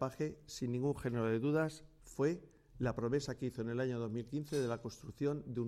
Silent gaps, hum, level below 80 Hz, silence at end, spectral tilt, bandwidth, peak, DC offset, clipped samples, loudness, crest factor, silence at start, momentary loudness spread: none; none; -62 dBFS; 0 s; -7 dB/octave; 15 kHz; -22 dBFS; under 0.1%; under 0.1%; -39 LUFS; 16 dB; 0 s; 8 LU